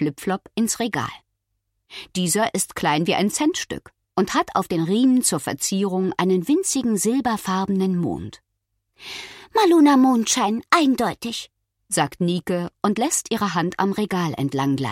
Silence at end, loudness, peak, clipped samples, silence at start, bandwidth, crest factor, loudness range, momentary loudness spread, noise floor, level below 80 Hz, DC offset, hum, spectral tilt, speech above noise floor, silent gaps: 0 s; -21 LUFS; -2 dBFS; under 0.1%; 0 s; 16.5 kHz; 20 dB; 4 LU; 14 LU; -75 dBFS; -58 dBFS; under 0.1%; none; -4.5 dB/octave; 54 dB; none